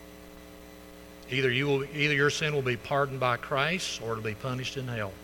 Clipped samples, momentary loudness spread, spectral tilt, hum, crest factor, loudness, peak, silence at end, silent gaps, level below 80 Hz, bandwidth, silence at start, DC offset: under 0.1%; 23 LU; -4.5 dB/octave; none; 20 dB; -29 LUFS; -10 dBFS; 0 s; none; -56 dBFS; 19 kHz; 0 s; under 0.1%